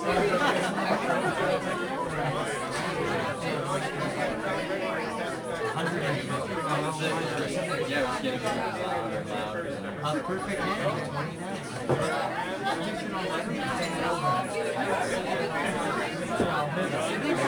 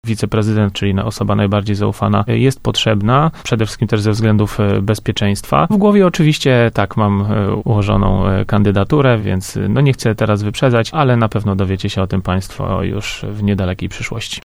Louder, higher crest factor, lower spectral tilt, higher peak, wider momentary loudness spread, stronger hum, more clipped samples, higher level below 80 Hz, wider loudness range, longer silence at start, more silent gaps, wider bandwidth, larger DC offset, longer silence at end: second, -29 LUFS vs -15 LUFS; about the same, 18 dB vs 14 dB; second, -5 dB/octave vs -6.5 dB/octave; second, -12 dBFS vs 0 dBFS; about the same, 5 LU vs 7 LU; neither; neither; second, -56 dBFS vs -32 dBFS; about the same, 2 LU vs 3 LU; about the same, 0 s vs 0.05 s; neither; first, 19.5 kHz vs 14 kHz; neither; about the same, 0 s vs 0.05 s